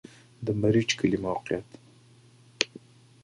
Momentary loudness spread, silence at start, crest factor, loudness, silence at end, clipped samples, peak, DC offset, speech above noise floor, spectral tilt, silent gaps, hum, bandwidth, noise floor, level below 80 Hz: 10 LU; 0.4 s; 30 dB; -28 LUFS; 0.6 s; under 0.1%; 0 dBFS; under 0.1%; 30 dB; -5 dB/octave; none; none; 11.5 kHz; -56 dBFS; -58 dBFS